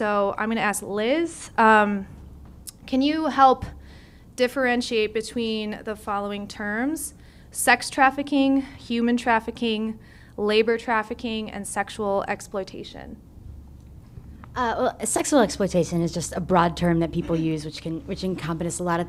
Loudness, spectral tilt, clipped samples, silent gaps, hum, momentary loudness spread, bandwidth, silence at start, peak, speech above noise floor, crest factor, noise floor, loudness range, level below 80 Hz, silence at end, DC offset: -23 LUFS; -4.5 dB/octave; under 0.1%; none; none; 16 LU; 15.5 kHz; 0 s; -2 dBFS; 23 dB; 22 dB; -47 dBFS; 6 LU; -46 dBFS; 0 s; under 0.1%